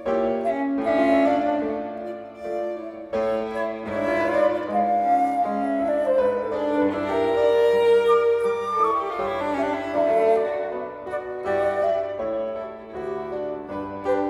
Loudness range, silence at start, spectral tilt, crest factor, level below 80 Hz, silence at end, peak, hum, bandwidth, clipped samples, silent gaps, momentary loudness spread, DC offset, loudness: 5 LU; 0 s; -6 dB/octave; 14 dB; -56 dBFS; 0 s; -8 dBFS; none; 11.5 kHz; under 0.1%; none; 12 LU; under 0.1%; -23 LUFS